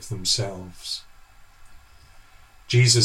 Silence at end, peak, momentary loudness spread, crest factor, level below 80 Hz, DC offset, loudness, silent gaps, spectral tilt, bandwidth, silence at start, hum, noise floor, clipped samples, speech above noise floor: 0 s; -4 dBFS; 14 LU; 20 dB; -52 dBFS; under 0.1%; -24 LUFS; none; -3.5 dB/octave; 14 kHz; 0 s; none; -49 dBFS; under 0.1%; 28 dB